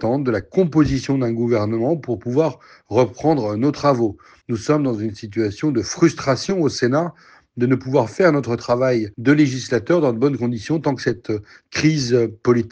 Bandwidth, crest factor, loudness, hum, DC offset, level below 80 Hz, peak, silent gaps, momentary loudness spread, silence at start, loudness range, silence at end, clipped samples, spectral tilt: 8.8 kHz; 16 dB; -19 LUFS; none; under 0.1%; -48 dBFS; -2 dBFS; none; 7 LU; 0 s; 2 LU; 0 s; under 0.1%; -6.5 dB/octave